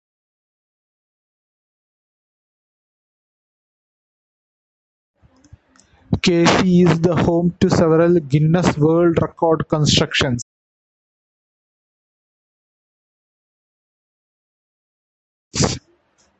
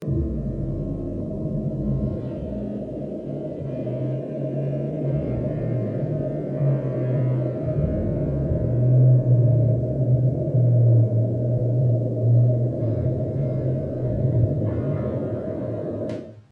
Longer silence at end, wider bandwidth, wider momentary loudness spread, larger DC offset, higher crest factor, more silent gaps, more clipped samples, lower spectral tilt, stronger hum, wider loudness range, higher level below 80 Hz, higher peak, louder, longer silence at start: first, 0.6 s vs 0.1 s; first, 8.4 kHz vs 2.8 kHz; second, 8 LU vs 12 LU; neither; first, 20 dB vs 14 dB; first, 10.42-15.51 s vs none; neither; second, -5.5 dB/octave vs -12 dB/octave; neither; first, 13 LU vs 9 LU; about the same, -42 dBFS vs -40 dBFS; first, -2 dBFS vs -8 dBFS; first, -16 LUFS vs -23 LUFS; first, 6.1 s vs 0 s